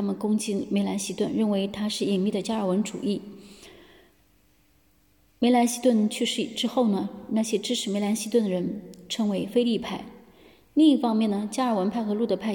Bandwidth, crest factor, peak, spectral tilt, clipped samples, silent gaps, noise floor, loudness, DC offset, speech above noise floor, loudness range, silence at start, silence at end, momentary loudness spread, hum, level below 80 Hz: 17.5 kHz; 16 dB; -10 dBFS; -5 dB/octave; under 0.1%; none; -63 dBFS; -25 LUFS; under 0.1%; 38 dB; 5 LU; 0 s; 0 s; 9 LU; none; -66 dBFS